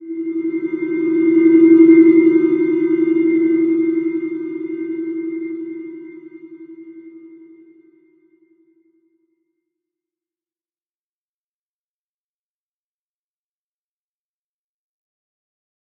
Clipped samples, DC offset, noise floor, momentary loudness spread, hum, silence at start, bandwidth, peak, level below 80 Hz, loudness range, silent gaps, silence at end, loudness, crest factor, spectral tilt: under 0.1%; under 0.1%; under -90 dBFS; 18 LU; none; 0 s; 2.3 kHz; -2 dBFS; -74 dBFS; 19 LU; none; 8.75 s; -15 LUFS; 18 dB; -8 dB/octave